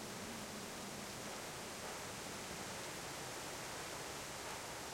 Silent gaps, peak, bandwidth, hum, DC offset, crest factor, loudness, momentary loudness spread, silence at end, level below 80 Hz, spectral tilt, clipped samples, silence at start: none; -34 dBFS; 16.5 kHz; none; under 0.1%; 14 dB; -46 LUFS; 1 LU; 0 s; -68 dBFS; -2.5 dB/octave; under 0.1%; 0 s